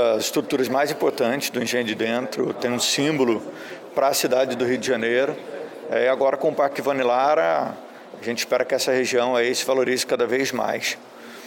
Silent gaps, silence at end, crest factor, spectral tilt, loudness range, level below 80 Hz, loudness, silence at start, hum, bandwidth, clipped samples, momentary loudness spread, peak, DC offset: none; 0 s; 16 dB; -3 dB/octave; 1 LU; -70 dBFS; -22 LUFS; 0 s; none; 17 kHz; under 0.1%; 9 LU; -8 dBFS; under 0.1%